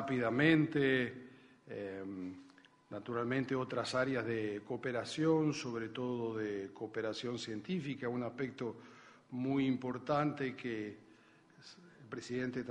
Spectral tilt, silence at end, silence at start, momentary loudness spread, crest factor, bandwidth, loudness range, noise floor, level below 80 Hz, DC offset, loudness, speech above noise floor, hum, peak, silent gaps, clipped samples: -6 dB/octave; 0 s; 0 s; 17 LU; 22 dB; 10.5 kHz; 4 LU; -64 dBFS; -74 dBFS; under 0.1%; -37 LUFS; 27 dB; none; -16 dBFS; none; under 0.1%